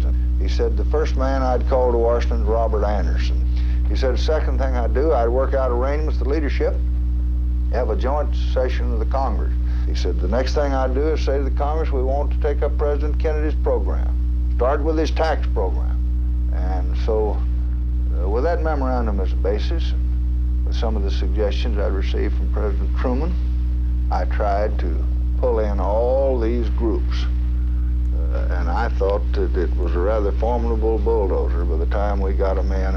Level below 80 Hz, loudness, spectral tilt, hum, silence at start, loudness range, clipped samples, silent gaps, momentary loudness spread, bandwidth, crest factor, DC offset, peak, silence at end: -20 dBFS; -21 LUFS; -8 dB/octave; 60 Hz at -20 dBFS; 0 s; 2 LU; under 0.1%; none; 3 LU; 6.4 kHz; 12 dB; under 0.1%; -8 dBFS; 0 s